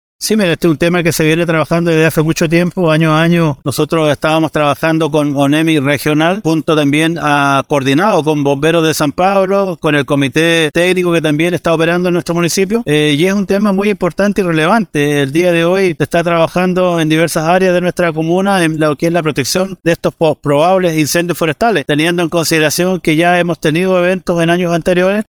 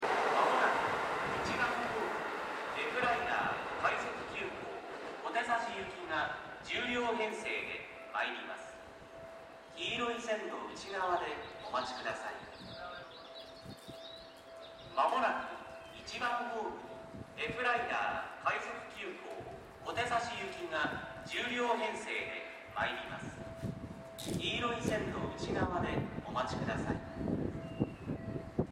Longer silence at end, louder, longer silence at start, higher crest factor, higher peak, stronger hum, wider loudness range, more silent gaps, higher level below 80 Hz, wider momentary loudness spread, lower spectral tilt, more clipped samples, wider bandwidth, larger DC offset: about the same, 0.05 s vs 0 s; first, -12 LUFS vs -37 LUFS; first, 0.2 s vs 0 s; second, 12 dB vs 20 dB; first, 0 dBFS vs -18 dBFS; neither; second, 1 LU vs 4 LU; neither; first, -42 dBFS vs -60 dBFS; second, 3 LU vs 15 LU; about the same, -5.5 dB/octave vs -4.5 dB/octave; neither; first, 20 kHz vs 16 kHz; neither